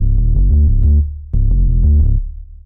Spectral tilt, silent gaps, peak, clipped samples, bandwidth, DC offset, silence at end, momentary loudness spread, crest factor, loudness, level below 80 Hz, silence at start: -15.5 dB/octave; none; -4 dBFS; under 0.1%; 0.8 kHz; under 0.1%; 0.1 s; 7 LU; 8 dB; -15 LUFS; -12 dBFS; 0 s